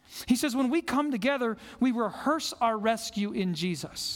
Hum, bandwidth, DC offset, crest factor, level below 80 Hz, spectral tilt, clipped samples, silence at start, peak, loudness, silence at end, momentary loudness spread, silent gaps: none; 18 kHz; under 0.1%; 16 dB; -62 dBFS; -4.5 dB/octave; under 0.1%; 0.1 s; -12 dBFS; -29 LUFS; 0 s; 5 LU; none